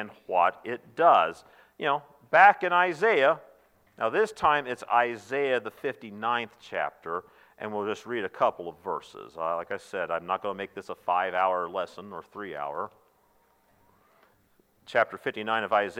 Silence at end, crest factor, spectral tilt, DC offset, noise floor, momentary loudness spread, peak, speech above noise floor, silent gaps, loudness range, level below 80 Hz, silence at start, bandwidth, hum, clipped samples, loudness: 0 s; 22 dB; -4.5 dB/octave; under 0.1%; -66 dBFS; 15 LU; -6 dBFS; 38 dB; none; 10 LU; -72 dBFS; 0 s; 15.5 kHz; none; under 0.1%; -27 LUFS